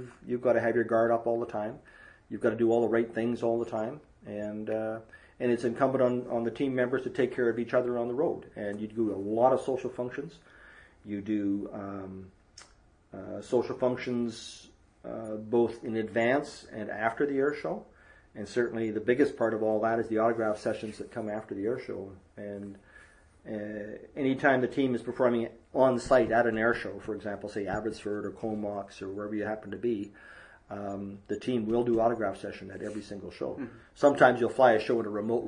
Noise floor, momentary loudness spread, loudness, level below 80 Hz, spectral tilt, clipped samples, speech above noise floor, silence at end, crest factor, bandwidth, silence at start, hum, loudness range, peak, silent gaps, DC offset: -61 dBFS; 16 LU; -30 LUFS; -62 dBFS; -6.5 dB/octave; under 0.1%; 31 dB; 0 s; 24 dB; 10.5 kHz; 0 s; none; 8 LU; -8 dBFS; none; under 0.1%